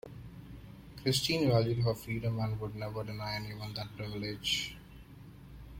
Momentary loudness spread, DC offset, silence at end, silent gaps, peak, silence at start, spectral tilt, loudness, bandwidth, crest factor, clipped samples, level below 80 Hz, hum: 23 LU; under 0.1%; 0 s; none; -16 dBFS; 0.05 s; -5 dB/octave; -34 LUFS; 16.5 kHz; 20 dB; under 0.1%; -56 dBFS; none